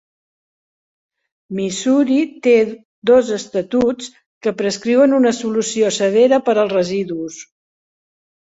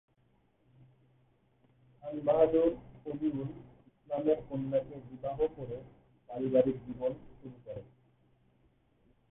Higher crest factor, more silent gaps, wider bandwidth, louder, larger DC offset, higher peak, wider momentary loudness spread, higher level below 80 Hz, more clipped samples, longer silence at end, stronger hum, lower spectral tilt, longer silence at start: second, 16 dB vs 22 dB; first, 2.85-3.02 s, 4.26-4.41 s vs none; first, 8 kHz vs 3.9 kHz; first, -16 LUFS vs -33 LUFS; neither; first, -2 dBFS vs -14 dBFS; second, 12 LU vs 20 LU; about the same, -60 dBFS vs -62 dBFS; neither; second, 1 s vs 1.45 s; neither; second, -4.5 dB/octave vs -11 dB/octave; second, 1.5 s vs 2.05 s